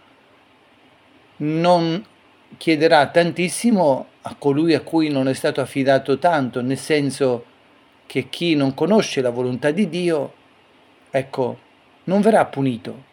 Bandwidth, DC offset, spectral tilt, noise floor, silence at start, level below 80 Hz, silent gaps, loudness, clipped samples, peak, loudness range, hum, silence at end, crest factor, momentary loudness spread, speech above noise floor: 18 kHz; under 0.1%; -5.5 dB/octave; -53 dBFS; 1.4 s; -70 dBFS; none; -19 LUFS; under 0.1%; 0 dBFS; 3 LU; none; 0.1 s; 20 dB; 10 LU; 35 dB